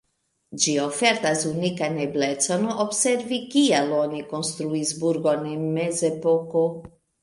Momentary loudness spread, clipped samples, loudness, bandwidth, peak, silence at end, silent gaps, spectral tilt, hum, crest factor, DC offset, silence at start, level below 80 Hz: 7 LU; under 0.1%; -23 LUFS; 11.5 kHz; -4 dBFS; 0.35 s; none; -3.5 dB/octave; none; 20 dB; under 0.1%; 0.5 s; -66 dBFS